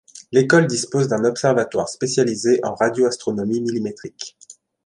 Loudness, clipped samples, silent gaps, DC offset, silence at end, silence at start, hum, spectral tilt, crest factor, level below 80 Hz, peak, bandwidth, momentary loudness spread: -19 LUFS; under 0.1%; none; under 0.1%; 0.35 s; 0.15 s; none; -5 dB/octave; 18 dB; -62 dBFS; -2 dBFS; 11.5 kHz; 13 LU